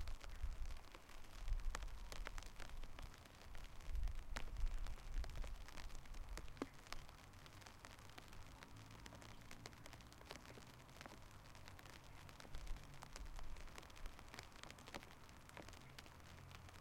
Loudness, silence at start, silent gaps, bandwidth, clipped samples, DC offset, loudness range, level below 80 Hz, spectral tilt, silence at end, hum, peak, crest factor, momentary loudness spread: -56 LUFS; 0 s; none; 16.5 kHz; under 0.1%; under 0.1%; 5 LU; -52 dBFS; -4 dB/octave; 0 s; none; -24 dBFS; 26 dB; 9 LU